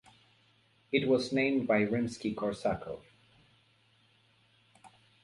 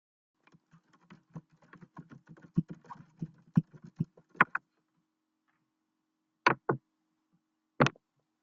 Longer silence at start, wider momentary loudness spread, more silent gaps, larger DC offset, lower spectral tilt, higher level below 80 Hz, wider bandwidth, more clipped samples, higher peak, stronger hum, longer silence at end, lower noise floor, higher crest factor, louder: second, 0.9 s vs 1.35 s; second, 10 LU vs 24 LU; neither; neither; about the same, -6 dB/octave vs -5 dB/octave; first, -64 dBFS vs -70 dBFS; first, 11.5 kHz vs 7.6 kHz; neither; second, -12 dBFS vs -8 dBFS; neither; second, 0.35 s vs 0.5 s; second, -68 dBFS vs -83 dBFS; second, 22 dB vs 28 dB; about the same, -31 LUFS vs -32 LUFS